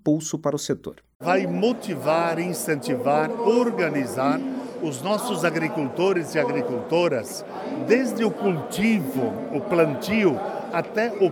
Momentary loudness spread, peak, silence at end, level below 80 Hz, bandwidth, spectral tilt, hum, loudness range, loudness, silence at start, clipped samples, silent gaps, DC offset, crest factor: 8 LU; -6 dBFS; 0 s; -64 dBFS; 19.5 kHz; -5.5 dB/octave; none; 1 LU; -24 LUFS; 0.05 s; under 0.1%; 1.15-1.20 s; under 0.1%; 18 dB